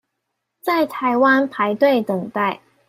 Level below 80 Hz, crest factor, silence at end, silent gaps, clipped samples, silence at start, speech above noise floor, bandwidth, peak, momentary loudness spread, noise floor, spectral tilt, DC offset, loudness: -68 dBFS; 16 dB; 0.3 s; none; under 0.1%; 0.65 s; 59 dB; 16 kHz; -4 dBFS; 8 LU; -77 dBFS; -6.5 dB/octave; under 0.1%; -19 LUFS